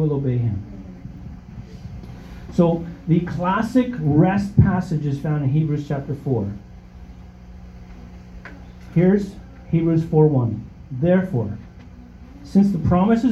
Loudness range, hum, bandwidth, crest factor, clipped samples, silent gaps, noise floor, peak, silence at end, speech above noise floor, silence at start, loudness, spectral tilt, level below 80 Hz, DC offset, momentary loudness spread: 6 LU; 60 Hz at -40 dBFS; 8.2 kHz; 20 dB; under 0.1%; none; -41 dBFS; -2 dBFS; 0 s; 22 dB; 0 s; -20 LUFS; -9.5 dB/octave; -40 dBFS; under 0.1%; 23 LU